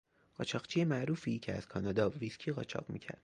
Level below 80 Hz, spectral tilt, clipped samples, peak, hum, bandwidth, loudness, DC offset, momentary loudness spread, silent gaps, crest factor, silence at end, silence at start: -64 dBFS; -6.5 dB/octave; under 0.1%; -18 dBFS; none; 10 kHz; -37 LUFS; under 0.1%; 9 LU; none; 20 dB; 0.1 s; 0.4 s